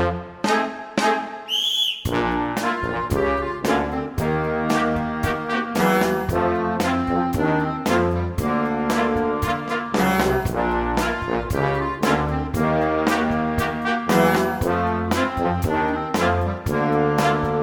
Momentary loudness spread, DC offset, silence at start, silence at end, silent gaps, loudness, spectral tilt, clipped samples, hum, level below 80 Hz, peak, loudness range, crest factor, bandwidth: 5 LU; under 0.1%; 0 s; 0 s; none; -21 LUFS; -5.5 dB/octave; under 0.1%; none; -38 dBFS; -4 dBFS; 1 LU; 18 dB; over 20 kHz